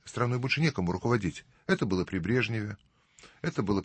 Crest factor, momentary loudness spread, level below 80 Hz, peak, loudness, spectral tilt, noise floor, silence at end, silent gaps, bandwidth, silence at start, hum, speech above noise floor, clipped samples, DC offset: 18 dB; 10 LU; -56 dBFS; -14 dBFS; -30 LUFS; -6.5 dB/octave; -58 dBFS; 0 s; none; 8.8 kHz; 0.05 s; none; 28 dB; under 0.1%; under 0.1%